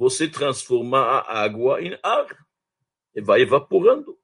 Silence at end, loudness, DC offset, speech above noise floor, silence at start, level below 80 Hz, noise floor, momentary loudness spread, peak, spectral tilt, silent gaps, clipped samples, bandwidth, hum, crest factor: 0.1 s; -20 LUFS; under 0.1%; 62 dB; 0 s; -68 dBFS; -82 dBFS; 8 LU; -4 dBFS; -4 dB/octave; none; under 0.1%; 11 kHz; none; 18 dB